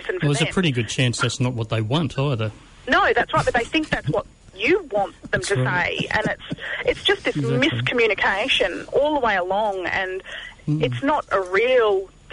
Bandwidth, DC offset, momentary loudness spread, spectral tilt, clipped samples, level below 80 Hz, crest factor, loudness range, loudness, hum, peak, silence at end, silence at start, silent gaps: 11 kHz; under 0.1%; 8 LU; -5 dB/octave; under 0.1%; -46 dBFS; 14 dB; 2 LU; -21 LUFS; none; -8 dBFS; 0.25 s; 0 s; none